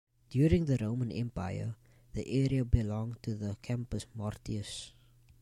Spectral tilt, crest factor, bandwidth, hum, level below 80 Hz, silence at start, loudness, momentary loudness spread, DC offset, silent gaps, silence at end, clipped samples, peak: -7.5 dB/octave; 22 dB; 12 kHz; none; -44 dBFS; 0.3 s; -34 LUFS; 14 LU; under 0.1%; none; 0.55 s; under 0.1%; -12 dBFS